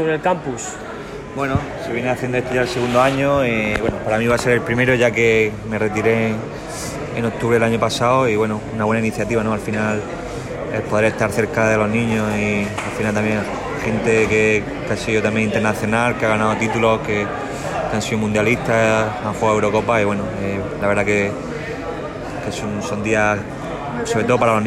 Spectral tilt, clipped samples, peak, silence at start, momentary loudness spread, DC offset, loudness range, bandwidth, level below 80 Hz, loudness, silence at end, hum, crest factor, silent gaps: -5.5 dB/octave; under 0.1%; -4 dBFS; 0 s; 10 LU; under 0.1%; 3 LU; 14.5 kHz; -40 dBFS; -19 LUFS; 0 s; none; 14 dB; none